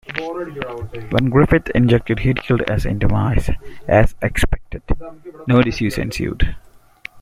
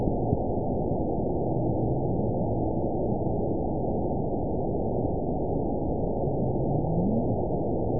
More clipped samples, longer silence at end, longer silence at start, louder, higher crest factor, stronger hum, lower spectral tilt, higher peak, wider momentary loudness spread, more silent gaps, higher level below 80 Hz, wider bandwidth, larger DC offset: neither; about the same, 0 s vs 0 s; about the same, 0.1 s vs 0 s; first, -19 LUFS vs -28 LUFS; about the same, 16 dB vs 16 dB; neither; second, -7 dB/octave vs -19 dB/octave; first, -2 dBFS vs -10 dBFS; first, 13 LU vs 2 LU; neither; first, -26 dBFS vs -38 dBFS; first, 15.5 kHz vs 1 kHz; second, under 0.1% vs 2%